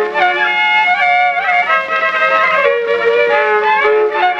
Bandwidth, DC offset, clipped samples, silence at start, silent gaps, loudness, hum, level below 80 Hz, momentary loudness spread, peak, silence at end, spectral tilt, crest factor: 8 kHz; under 0.1%; under 0.1%; 0 s; none; -12 LUFS; none; -60 dBFS; 3 LU; -2 dBFS; 0 s; -3 dB/octave; 12 dB